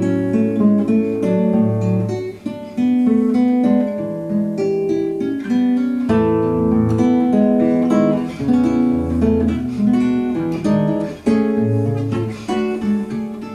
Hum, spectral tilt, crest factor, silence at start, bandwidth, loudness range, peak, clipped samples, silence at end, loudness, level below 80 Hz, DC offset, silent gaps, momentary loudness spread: none; -8.5 dB/octave; 14 dB; 0 s; 10 kHz; 2 LU; -2 dBFS; under 0.1%; 0 s; -17 LUFS; -42 dBFS; under 0.1%; none; 7 LU